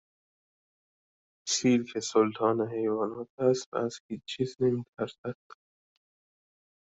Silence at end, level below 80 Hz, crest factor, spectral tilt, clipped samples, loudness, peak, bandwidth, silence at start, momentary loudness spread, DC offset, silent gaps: 1.6 s; -70 dBFS; 20 dB; -4.5 dB/octave; under 0.1%; -29 LUFS; -12 dBFS; 8.2 kHz; 1.45 s; 14 LU; under 0.1%; 3.30-3.38 s, 3.66-3.72 s, 4.00-4.09 s, 4.88-4.93 s, 5.18-5.24 s